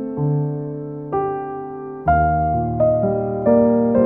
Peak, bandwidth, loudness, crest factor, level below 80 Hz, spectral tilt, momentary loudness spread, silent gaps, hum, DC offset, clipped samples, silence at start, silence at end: -4 dBFS; 3 kHz; -19 LUFS; 14 dB; -36 dBFS; -13.5 dB/octave; 13 LU; none; none; under 0.1%; under 0.1%; 0 s; 0 s